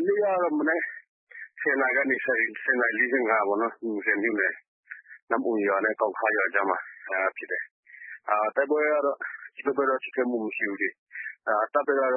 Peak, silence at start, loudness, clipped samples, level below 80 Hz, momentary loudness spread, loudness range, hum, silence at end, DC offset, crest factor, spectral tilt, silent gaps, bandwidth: -8 dBFS; 0 s; -26 LUFS; under 0.1%; under -90 dBFS; 15 LU; 3 LU; none; 0 s; under 0.1%; 18 dB; -9 dB/octave; 1.08-1.27 s, 4.68-4.83 s, 5.22-5.27 s, 7.71-7.83 s, 10.98-11.07 s; 3.6 kHz